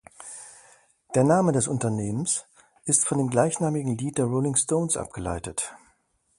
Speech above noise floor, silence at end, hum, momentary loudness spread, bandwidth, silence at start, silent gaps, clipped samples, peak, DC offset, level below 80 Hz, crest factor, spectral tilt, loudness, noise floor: 43 dB; 0.65 s; none; 15 LU; 11.5 kHz; 0.2 s; none; under 0.1%; -2 dBFS; under 0.1%; -52 dBFS; 24 dB; -5 dB/octave; -25 LUFS; -67 dBFS